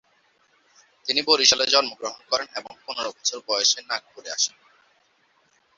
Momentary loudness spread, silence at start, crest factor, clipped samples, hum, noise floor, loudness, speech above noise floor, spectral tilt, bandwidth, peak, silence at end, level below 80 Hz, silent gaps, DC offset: 17 LU; 1.05 s; 24 dB; under 0.1%; none; -64 dBFS; -22 LUFS; 40 dB; 1 dB/octave; 8 kHz; -2 dBFS; 1.3 s; -70 dBFS; none; under 0.1%